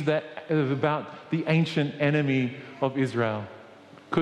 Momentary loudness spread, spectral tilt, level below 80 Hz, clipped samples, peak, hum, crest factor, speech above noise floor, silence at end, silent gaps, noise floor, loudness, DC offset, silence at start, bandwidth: 8 LU; -7.5 dB/octave; -68 dBFS; under 0.1%; -10 dBFS; none; 18 dB; 23 dB; 0 s; none; -49 dBFS; -27 LUFS; under 0.1%; 0 s; 9.4 kHz